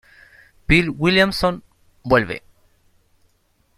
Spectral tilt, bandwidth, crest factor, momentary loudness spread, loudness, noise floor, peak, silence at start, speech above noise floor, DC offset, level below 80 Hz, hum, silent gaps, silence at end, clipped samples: -5.5 dB/octave; 15 kHz; 20 dB; 19 LU; -18 LUFS; -63 dBFS; -2 dBFS; 0.7 s; 45 dB; under 0.1%; -38 dBFS; none; none; 1.4 s; under 0.1%